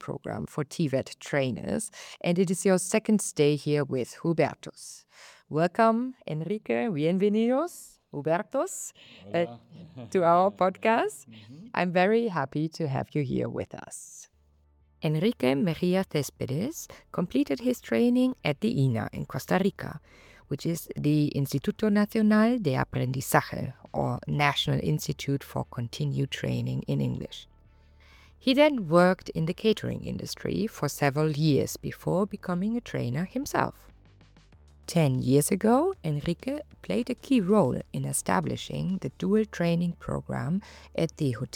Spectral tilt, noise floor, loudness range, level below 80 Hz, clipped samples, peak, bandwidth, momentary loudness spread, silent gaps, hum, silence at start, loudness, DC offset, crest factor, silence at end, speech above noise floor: -6 dB/octave; -64 dBFS; 4 LU; -56 dBFS; under 0.1%; -8 dBFS; 18.5 kHz; 12 LU; none; none; 0 s; -28 LUFS; under 0.1%; 20 dB; 0.1 s; 36 dB